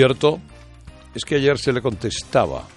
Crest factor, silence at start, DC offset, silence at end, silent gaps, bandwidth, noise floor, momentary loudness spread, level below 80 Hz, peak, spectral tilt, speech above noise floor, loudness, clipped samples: 18 dB; 0 s; under 0.1%; 0.1 s; none; 11.5 kHz; -42 dBFS; 13 LU; -44 dBFS; -2 dBFS; -5 dB/octave; 23 dB; -21 LUFS; under 0.1%